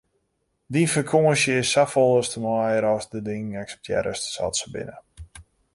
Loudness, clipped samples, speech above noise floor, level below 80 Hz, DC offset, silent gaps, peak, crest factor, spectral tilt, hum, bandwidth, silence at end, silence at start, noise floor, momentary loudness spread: -22 LUFS; under 0.1%; 51 dB; -54 dBFS; under 0.1%; none; -6 dBFS; 18 dB; -4.5 dB/octave; none; 11.5 kHz; 0.35 s; 0.7 s; -73 dBFS; 13 LU